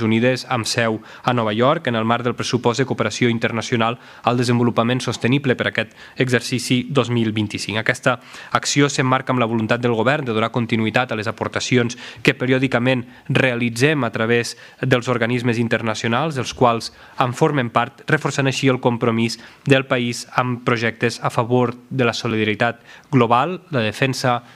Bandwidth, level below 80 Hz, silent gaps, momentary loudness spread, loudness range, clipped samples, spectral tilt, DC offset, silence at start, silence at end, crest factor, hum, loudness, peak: 14 kHz; -58 dBFS; none; 5 LU; 1 LU; under 0.1%; -5 dB/octave; under 0.1%; 0 s; 0.15 s; 20 dB; none; -19 LUFS; 0 dBFS